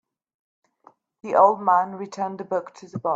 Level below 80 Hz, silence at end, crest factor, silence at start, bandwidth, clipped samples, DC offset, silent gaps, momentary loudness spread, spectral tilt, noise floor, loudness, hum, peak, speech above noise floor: -74 dBFS; 0 s; 20 dB; 1.25 s; 8 kHz; under 0.1%; under 0.1%; none; 14 LU; -6.5 dB/octave; -57 dBFS; -22 LUFS; none; -4 dBFS; 35 dB